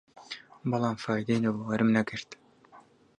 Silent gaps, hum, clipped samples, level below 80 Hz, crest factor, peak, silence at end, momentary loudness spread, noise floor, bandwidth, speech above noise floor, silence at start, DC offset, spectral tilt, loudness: none; none; under 0.1%; -68 dBFS; 20 dB; -10 dBFS; 0.4 s; 17 LU; -57 dBFS; 9.8 kHz; 29 dB; 0.15 s; under 0.1%; -6.5 dB/octave; -29 LUFS